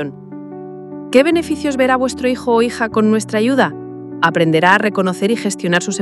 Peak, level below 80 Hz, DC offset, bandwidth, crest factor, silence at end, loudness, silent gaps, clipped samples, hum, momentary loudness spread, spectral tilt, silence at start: 0 dBFS; -52 dBFS; under 0.1%; 12.5 kHz; 16 dB; 0 s; -15 LUFS; none; under 0.1%; none; 18 LU; -5 dB/octave; 0 s